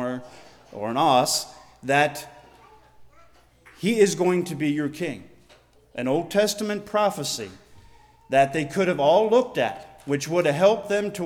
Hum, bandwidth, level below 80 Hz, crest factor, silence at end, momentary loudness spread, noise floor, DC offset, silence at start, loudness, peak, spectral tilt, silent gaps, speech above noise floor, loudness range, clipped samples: none; 18.5 kHz; -62 dBFS; 18 dB; 0 s; 17 LU; -56 dBFS; under 0.1%; 0 s; -23 LUFS; -6 dBFS; -4.5 dB/octave; none; 33 dB; 4 LU; under 0.1%